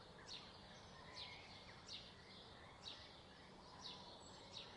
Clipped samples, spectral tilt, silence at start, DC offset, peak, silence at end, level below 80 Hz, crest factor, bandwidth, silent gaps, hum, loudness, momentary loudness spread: under 0.1%; -3 dB/octave; 0 s; under 0.1%; -40 dBFS; 0 s; -74 dBFS; 20 dB; 11 kHz; none; none; -56 LUFS; 6 LU